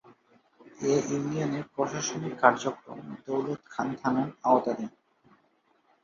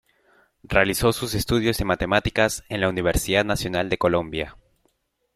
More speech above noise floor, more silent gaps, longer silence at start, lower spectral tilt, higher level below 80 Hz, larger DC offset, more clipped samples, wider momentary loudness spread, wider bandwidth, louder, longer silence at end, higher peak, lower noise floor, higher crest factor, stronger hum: second, 40 dB vs 47 dB; neither; about the same, 0.65 s vs 0.7 s; about the same, -5 dB/octave vs -4.5 dB/octave; second, -70 dBFS vs -38 dBFS; neither; neither; first, 12 LU vs 5 LU; second, 7.6 kHz vs 16 kHz; second, -29 LUFS vs -22 LUFS; first, 1.15 s vs 0.85 s; about the same, -4 dBFS vs -2 dBFS; about the same, -68 dBFS vs -69 dBFS; about the same, 26 dB vs 22 dB; neither